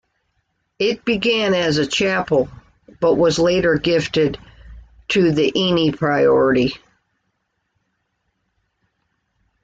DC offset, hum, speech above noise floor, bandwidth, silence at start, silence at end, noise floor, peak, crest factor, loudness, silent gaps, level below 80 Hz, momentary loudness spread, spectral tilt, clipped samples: under 0.1%; none; 55 dB; 9 kHz; 0.8 s; 2.85 s; -71 dBFS; -6 dBFS; 14 dB; -17 LUFS; none; -48 dBFS; 7 LU; -5 dB/octave; under 0.1%